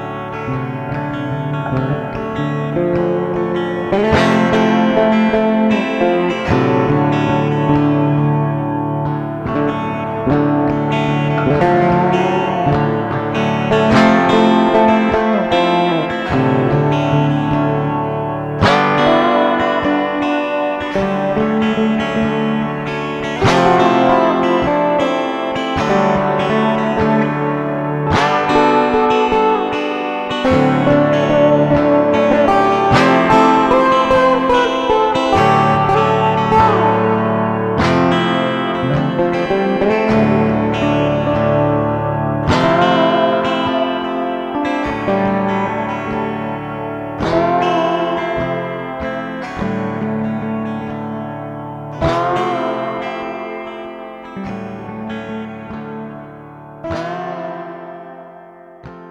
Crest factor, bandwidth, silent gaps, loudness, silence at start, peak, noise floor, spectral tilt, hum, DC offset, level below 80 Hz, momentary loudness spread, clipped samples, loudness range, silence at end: 14 dB; 9.6 kHz; none; -15 LUFS; 0 s; 0 dBFS; -38 dBFS; -7 dB/octave; none; under 0.1%; -40 dBFS; 12 LU; under 0.1%; 9 LU; 0 s